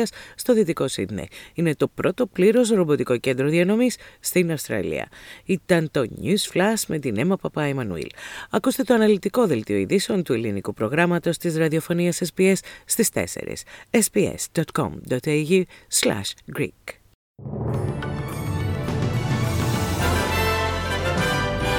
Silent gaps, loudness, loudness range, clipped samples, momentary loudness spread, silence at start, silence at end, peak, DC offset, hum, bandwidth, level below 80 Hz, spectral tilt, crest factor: 17.15-17.35 s; -23 LUFS; 4 LU; under 0.1%; 10 LU; 0 s; 0 s; -4 dBFS; under 0.1%; none; 19 kHz; -42 dBFS; -5 dB/octave; 20 dB